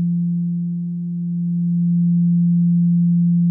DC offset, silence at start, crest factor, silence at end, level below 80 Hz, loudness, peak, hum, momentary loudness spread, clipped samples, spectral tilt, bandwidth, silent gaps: under 0.1%; 0 s; 6 dB; 0 s; -78 dBFS; -18 LUFS; -12 dBFS; none; 8 LU; under 0.1%; -16 dB/octave; 0.4 kHz; none